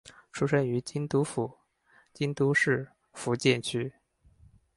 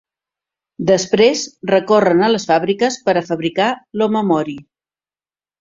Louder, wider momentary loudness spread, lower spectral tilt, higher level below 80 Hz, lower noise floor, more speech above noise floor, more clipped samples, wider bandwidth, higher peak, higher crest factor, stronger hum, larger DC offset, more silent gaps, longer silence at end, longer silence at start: second, -29 LUFS vs -16 LUFS; first, 12 LU vs 7 LU; about the same, -5.5 dB/octave vs -4.5 dB/octave; second, -66 dBFS vs -58 dBFS; second, -64 dBFS vs under -90 dBFS; second, 36 dB vs over 75 dB; neither; first, 11.5 kHz vs 7.8 kHz; second, -10 dBFS vs 0 dBFS; about the same, 20 dB vs 16 dB; neither; neither; neither; second, 0.85 s vs 1 s; second, 0.05 s vs 0.8 s